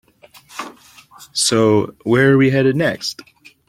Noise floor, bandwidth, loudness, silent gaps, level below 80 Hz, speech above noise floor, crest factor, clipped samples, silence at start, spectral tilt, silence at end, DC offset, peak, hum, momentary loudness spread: -47 dBFS; 16 kHz; -16 LUFS; none; -54 dBFS; 32 dB; 16 dB; under 0.1%; 0.55 s; -4.5 dB/octave; 0.55 s; under 0.1%; -2 dBFS; none; 20 LU